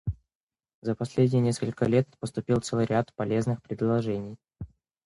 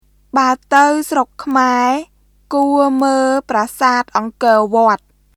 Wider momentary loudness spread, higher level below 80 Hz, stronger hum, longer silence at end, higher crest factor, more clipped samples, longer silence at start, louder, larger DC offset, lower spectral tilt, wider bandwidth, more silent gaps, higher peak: first, 19 LU vs 7 LU; about the same, -50 dBFS vs -54 dBFS; second, none vs 50 Hz at -55 dBFS; about the same, 0.4 s vs 0.4 s; about the same, 18 dB vs 14 dB; neither; second, 0.05 s vs 0.35 s; second, -28 LUFS vs -14 LUFS; neither; first, -7 dB/octave vs -3.5 dB/octave; second, 11.5 kHz vs 15.5 kHz; first, 0.35-0.47 s, 0.74-0.82 s vs none; second, -10 dBFS vs 0 dBFS